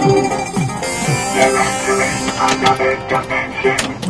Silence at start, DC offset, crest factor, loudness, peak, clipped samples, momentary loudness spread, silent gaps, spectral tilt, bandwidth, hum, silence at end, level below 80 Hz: 0 s; under 0.1%; 16 dB; -16 LUFS; 0 dBFS; under 0.1%; 6 LU; none; -4 dB/octave; 11 kHz; none; 0 s; -40 dBFS